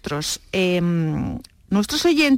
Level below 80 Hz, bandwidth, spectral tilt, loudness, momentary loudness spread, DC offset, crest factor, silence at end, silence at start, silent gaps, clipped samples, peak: -44 dBFS; 16.5 kHz; -5 dB/octave; -21 LUFS; 9 LU; under 0.1%; 12 dB; 0 s; 0.05 s; none; under 0.1%; -8 dBFS